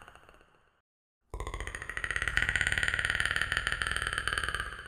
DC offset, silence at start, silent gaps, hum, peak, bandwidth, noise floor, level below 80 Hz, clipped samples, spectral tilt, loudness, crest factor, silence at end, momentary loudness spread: under 0.1%; 0 s; 0.80-1.21 s; none; -10 dBFS; 16.5 kHz; -62 dBFS; -44 dBFS; under 0.1%; -2 dB/octave; -31 LUFS; 24 dB; 0 s; 12 LU